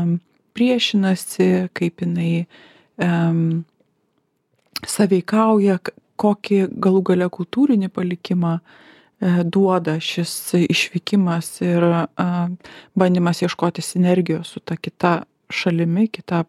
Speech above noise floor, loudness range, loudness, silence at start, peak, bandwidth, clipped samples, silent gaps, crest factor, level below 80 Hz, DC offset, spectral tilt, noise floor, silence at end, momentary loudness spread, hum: 49 dB; 3 LU; -19 LUFS; 0 s; 0 dBFS; 14 kHz; under 0.1%; none; 18 dB; -64 dBFS; under 0.1%; -6 dB/octave; -68 dBFS; 0.05 s; 9 LU; none